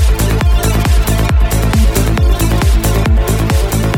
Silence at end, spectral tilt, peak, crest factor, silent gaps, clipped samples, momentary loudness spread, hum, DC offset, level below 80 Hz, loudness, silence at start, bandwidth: 0 s; -5.5 dB/octave; 0 dBFS; 10 dB; none; under 0.1%; 1 LU; none; under 0.1%; -12 dBFS; -13 LUFS; 0 s; 17 kHz